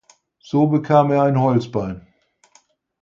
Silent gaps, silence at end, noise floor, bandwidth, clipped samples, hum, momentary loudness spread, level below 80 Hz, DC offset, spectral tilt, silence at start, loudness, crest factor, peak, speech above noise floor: none; 1.05 s; -58 dBFS; 7.4 kHz; under 0.1%; none; 12 LU; -54 dBFS; under 0.1%; -9 dB/octave; 0.55 s; -18 LUFS; 18 dB; -2 dBFS; 41 dB